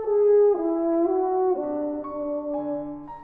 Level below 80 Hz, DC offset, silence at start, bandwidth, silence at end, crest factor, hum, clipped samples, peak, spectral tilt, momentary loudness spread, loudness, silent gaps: -58 dBFS; under 0.1%; 0 s; 2.5 kHz; 0 s; 12 dB; none; under 0.1%; -12 dBFS; -11.5 dB/octave; 12 LU; -24 LUFS; none